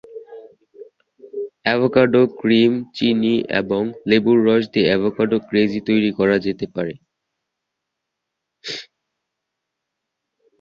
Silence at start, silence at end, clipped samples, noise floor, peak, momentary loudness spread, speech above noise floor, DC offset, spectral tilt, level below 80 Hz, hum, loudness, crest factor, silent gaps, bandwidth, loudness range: 0.1 s; 1.8 s; under 0.1%; -80 dBFS; -2 dBFS; 16 LU; 63 dB; under 0.1%; -7 dB/octave; -58 dBFS; none; -18 LUFS; 18 dB; none; 7.2 kHz; 19 LU